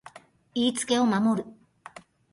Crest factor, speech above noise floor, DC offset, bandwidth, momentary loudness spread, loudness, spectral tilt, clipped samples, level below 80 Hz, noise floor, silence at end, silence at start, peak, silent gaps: 16 dB; 26 dB; under 0.1%; 11.5 kHz; 24 LU; -26 LUFS; -4 dB/octave; under 0.1%; -68 dBFS; -51 dBFS; 0.8 s; 0.15 s; -12 dBFS; none